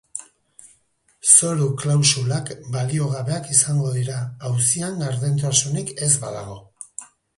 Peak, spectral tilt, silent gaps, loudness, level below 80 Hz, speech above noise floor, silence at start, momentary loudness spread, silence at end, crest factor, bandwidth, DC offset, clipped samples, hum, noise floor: 0 dBFS; -3.5 dB/octave; none; -19 LUFS; -58 dBFS; 41 dB; 0.15 s; 22 LU; 0.3 s; 22 dB; 11.5 kHz; under 0.1%; under 0.1%; none; -62 dBFS